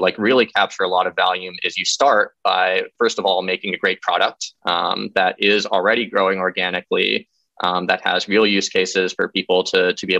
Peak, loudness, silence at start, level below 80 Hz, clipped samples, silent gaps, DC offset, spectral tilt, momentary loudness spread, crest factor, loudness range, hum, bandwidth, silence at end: -2 dBFS; -18 LUFS; 0 s; -66 dBFS; under 0.1%; none; under 0.1%; -3 dB/octave; 6 LU; 16 dB; 1 LU; none; 8.6 kHz; 0 s